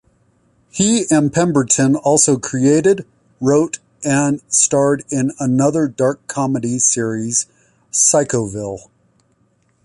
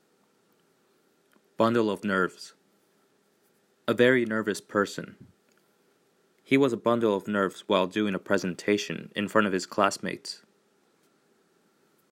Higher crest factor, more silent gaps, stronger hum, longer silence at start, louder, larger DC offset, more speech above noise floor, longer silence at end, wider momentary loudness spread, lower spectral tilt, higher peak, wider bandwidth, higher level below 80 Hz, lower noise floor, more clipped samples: second, 16 dB vs 22 dB; neither; neither; second, 0.75 s vs 1.6 s; first, -16 LUFS vs -27 LUFS; neither; about the same, 44 dB vs 41 dB; second, 1.05 s vs 1.75 s; second, 9 LU vs 13 LU; about the same, -4.5 dB/octave vs -5 dB/octave; first, 0 dBFS vs -6 dBFS; second, 11.5 kHz vs 16 kHz; first, -54 dBFS vs -76 dBFS; second, -60 dBFS vs -67 dBFS; neither